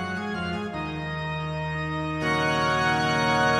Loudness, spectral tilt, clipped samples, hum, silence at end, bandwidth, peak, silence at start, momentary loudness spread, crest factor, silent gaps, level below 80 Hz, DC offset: -26 LUFS; -5 dB/octave; under 0.1%; none; 0 s; 14 kHz; -10 dBFS; 0 s; 8 LU; 16 dB; none; -48 dBFS; under 0.1%